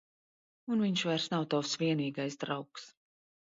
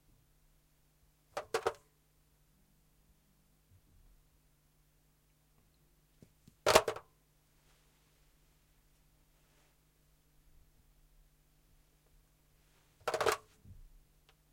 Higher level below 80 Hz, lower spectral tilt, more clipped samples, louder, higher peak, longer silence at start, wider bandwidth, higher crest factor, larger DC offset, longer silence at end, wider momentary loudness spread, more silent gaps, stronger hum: second, -80 dBFS vs -68 dBFS; first, -5 dB/octave vs -2 dB/octave; neither; about the same, -33 LUFS vs -34 LUFS; second, -20 dBFS vs -6 dBFS; second, 0.65 s vs 1.35 s; second, 7.8 kHz vs 16.5 kHz; second, 16 dB vs 36 dB; neither; about the same, 0.7 s vs 0.7 s; second, 14 LU vs 19 LU; neither; neither